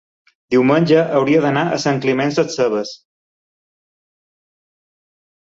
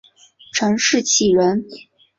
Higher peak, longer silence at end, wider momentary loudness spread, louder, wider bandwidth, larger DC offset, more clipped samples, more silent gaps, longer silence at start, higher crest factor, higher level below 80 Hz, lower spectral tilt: about the same, -2 dBFS vs -4 dBFS; first, 2.55 s vs 0.4 s; second, 5 LU vs 11 LU; about the same, -16 LUFS vs -17 LUFS; about the same, 7.8 kHz vs 7.8 kHz; neither; neither; neither; about the same, 0.5 s vs 0.55 s; about the same, 16 dB vs 16 dB; about the same, -60 dBFS vs -56 dBFS; first, -6 dB/octave vs -3 dB/octave